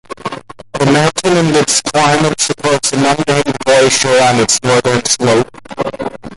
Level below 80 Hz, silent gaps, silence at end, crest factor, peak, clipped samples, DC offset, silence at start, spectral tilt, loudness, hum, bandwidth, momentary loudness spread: -44 dBFS; none; 0 s; 12 dB; 0 dBFS; under 0.1%; under 0.1%; 0.1 s; -3.5 dB/octave; -11 LUFS; none; 11.5 kHz; 13 LU